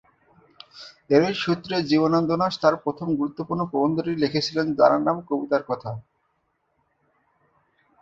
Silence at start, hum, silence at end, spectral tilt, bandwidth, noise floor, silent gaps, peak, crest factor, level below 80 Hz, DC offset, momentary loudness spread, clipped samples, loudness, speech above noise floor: 0.75 s; none; 2 s; -6.5 dB/octave; 7.6 kHz; -72 dBFS; none; -4 dBFS; 20 dB; -62 dBFS; under 0.1%; 11 LU; under 0.1%; -23 LUFS; 49 dB